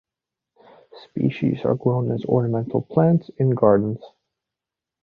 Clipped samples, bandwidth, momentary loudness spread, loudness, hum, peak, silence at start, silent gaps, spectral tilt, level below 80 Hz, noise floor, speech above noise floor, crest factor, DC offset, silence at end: under 0.1%; 4.9 kHz; 7 LU; -21 LUFS; none; -2 dBFS; 0.95 s; none; -11.5 dB/octave; -58 dBFS; -87 dBFS; 67 dB; 20 dB; under 0.1%; 0.95 s